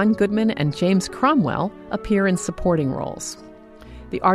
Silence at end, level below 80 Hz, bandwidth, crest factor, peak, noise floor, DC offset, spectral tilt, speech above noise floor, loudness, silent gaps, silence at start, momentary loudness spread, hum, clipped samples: 0 s; -42 dBFS; 13.5 kHz; 18 dB; -4 dBFS; -41 dBFS; under 0.1%; -6 dB/octave; 21 dB; -21 LUFS; none; 0 s; 13 LU; none; under 0.1%